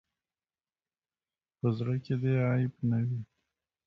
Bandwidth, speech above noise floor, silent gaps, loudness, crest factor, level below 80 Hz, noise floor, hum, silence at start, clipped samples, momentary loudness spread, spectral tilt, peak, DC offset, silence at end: 5.8 kHz; over 61 dB; none; -31 LUFS; 16 dB; -66 dBFS; under -90 dBFS; none; 1.65 s; under 0.1%; 8 LU; -10.5 dB/octave; -16 dBFS; under 0.1%; 0.65 s